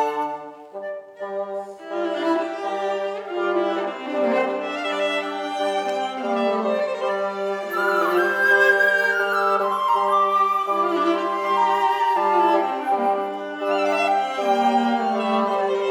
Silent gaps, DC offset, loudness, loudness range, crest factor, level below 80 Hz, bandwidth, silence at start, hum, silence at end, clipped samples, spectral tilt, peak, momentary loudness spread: none; under 0.1%; -21 LUFS; 6 LU; 16 dB; -86 dBFS; 19.5 kHz; 0 s; none; 0 s; under 0.1%; -4 dB/octave; -6 dBFS; 10 LU